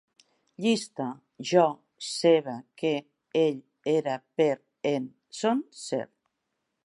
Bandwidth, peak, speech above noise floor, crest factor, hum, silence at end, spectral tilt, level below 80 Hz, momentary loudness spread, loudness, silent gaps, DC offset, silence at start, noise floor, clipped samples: 11.5 kHz; -8 dBFS; 54 dB; 20 dB; none; 0.8 s; -5 dB/octave; -82 dBFS; 12 LU; -28 LUFS; none; under 0.1%; 0.6 s; -81 dBFS; under 0.1%